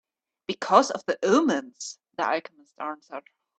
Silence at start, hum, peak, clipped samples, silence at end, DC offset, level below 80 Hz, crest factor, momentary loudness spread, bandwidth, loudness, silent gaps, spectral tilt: 0.5 s; none; -4 dBFS; under 0.1%; 0.4 s; under 0.1%; -74 dBFS; 24 dB; 19 LU; 9 kHz; -25 LUFS; none; -3.5 dB/octave